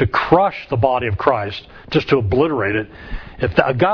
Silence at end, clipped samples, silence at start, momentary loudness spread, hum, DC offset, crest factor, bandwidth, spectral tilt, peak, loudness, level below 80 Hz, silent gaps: 0 s; under 0.1%; 0 s; 14 LU; none; under 0.1%; 18 dB; 5.4 kHz; -8 dB/octave; 0 dBFS; -18 LUFS; -36 dBFS; none